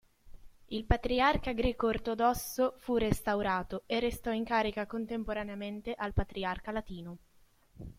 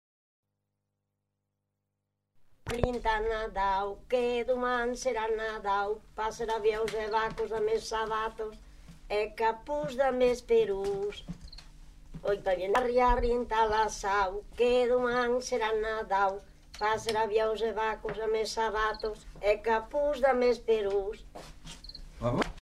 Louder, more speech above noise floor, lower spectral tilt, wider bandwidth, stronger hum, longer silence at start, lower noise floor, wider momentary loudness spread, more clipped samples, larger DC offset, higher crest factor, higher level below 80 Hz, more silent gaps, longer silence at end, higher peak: second, -33 LUFS vs -30 LUFS; second, 31 dB vs 54 dB; about the same, -5.5 dB/octave vs -4.5 dB/octave; first, 16.5 kHz vs 14 kHz; second, none vs 50 Hz at -65 dBFS; second, 0.25 s vs 2.65 s; second, -64 dBFS vs -84 dBFS; about the same, 11 LU vs 12 LU; neither; neither; about the same, 22 dB vs 22 dB; about the same, -44 dBFS vs -46 dBFS; neither; about the same, 0.05 s vs 0 s; about the same, -12 dBFS vs -10 dBFS